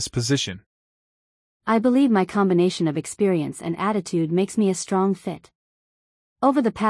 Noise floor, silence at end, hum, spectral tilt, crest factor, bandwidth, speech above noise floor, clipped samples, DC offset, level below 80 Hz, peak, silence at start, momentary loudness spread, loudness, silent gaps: under -90 dBFS; 0 s; none; -5.5 dB/octave; 16 dB; 12 kHz; over 69 dB; under 0.1%; under 0.1%; -60 dBFS; -6 dBFS; 0 s; 11 LU; -22 LUFS; 0.66-1.60 s, 5.55-6.36 s